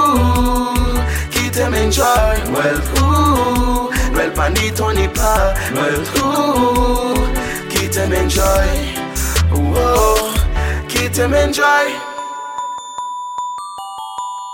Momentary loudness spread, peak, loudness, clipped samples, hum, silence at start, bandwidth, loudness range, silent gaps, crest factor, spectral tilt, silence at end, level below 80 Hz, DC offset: 12 LU; -2 dBFS; -16 LUFS; under 0.1%; none; 0 s; 17 kHz; 2 LU; none; 14 dB; -4.5 dB/octave; 0 s; -20 dBFS; under 0.1%